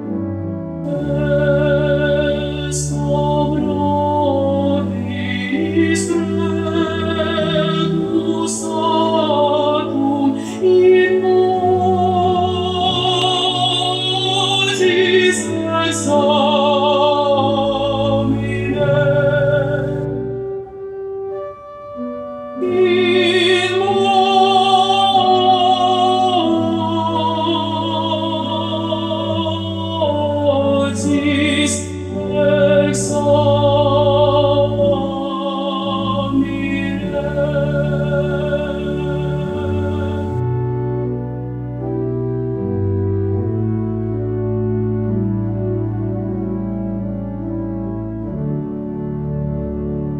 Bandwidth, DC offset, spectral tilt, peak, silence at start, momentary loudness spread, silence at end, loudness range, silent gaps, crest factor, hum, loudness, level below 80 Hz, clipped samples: 12 kHz; under 0.1%; -5.5 dB/octave; -2 dBFS; 0 s; 10 LU; 0 s; 7 LU; none; 14 dB; none; -17 LUFS; -38 dBFS; under 0.1%